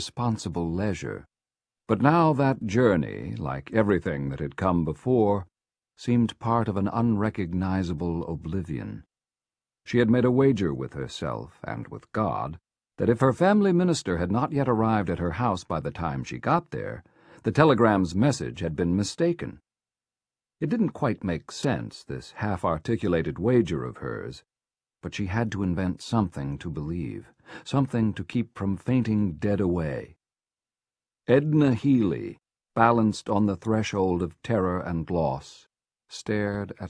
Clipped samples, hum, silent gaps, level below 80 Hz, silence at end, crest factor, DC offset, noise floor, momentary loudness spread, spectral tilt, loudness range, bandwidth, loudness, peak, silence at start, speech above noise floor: under 0.1%; none; none; -50 dBFS; 0 s; 24 dB; under 0.1%; under -90 dBFS; 14 LU; -7 dB/octave; 5 LU; 10.5 kHz; -26 LUFS; -2 dBFS; 0 s; over 65 dB